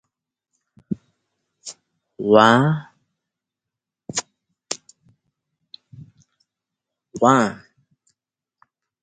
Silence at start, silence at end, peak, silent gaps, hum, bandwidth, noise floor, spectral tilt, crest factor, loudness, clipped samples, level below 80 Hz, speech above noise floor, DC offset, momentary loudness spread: 0.9 s; 1.5 s; 0 dBFS; none; none; 9.6 kHz; -86 dBFS; -5 dB/octave; 24 dB; -19 LUFS; under 0.1%; -64 dBFS; 71 dB; under 0.1%; 25 LU